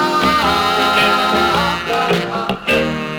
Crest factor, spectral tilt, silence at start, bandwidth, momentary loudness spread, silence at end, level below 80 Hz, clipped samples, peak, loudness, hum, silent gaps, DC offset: 12 dB; -4 dB/octave; 0 s; over 20 kHz; 5 LU; 0 s; -40 dBFS; under 0.1%; -2 dBFS; -15 LUFS; none; none; under 0.1%